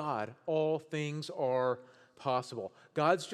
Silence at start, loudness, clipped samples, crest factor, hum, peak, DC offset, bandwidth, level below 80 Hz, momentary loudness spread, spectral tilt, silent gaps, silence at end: 0 s; -35 LUFS; under 0.1%; 20 dB; none; -14 dBFS; under 0.1%; 12.5 kHz; -90 dBFS; 10 LU; -5.5 dB/octave; none; 0 s